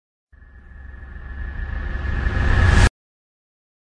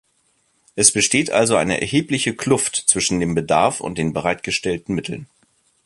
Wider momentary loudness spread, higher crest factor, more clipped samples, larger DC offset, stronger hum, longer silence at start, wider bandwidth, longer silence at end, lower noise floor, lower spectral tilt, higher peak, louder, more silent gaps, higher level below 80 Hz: first, 23 LU vs 10 LU; about the same, 20 dB vs 20 dB; neither; neither; neither; second, 0.55 s vs 0.75 s; second, 10.5 kHz vs 12 kHz; first, 1.1 s vs 0.6 s; second, -43 dBFS vs -64 dBFS; first, -5.5 dB/octave vs -3 dB/octave; about the same, -2 dBFS vs 0 dBFS; second, -21 LUFS vs -18 LUFS; neither; first, -24 dBFS vs -48 dBFS